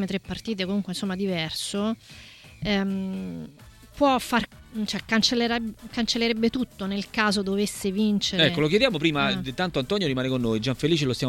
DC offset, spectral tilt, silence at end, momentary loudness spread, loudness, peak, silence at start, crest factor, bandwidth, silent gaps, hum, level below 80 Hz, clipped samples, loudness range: under 0.1%; -4.5 dB/octave; 0 s; 11 LU; -25 LUFS; -6 dBFS; 0 s; 20 dB; 17 kHz; none; none; -50 dBFS; under 0.1%; 5 LU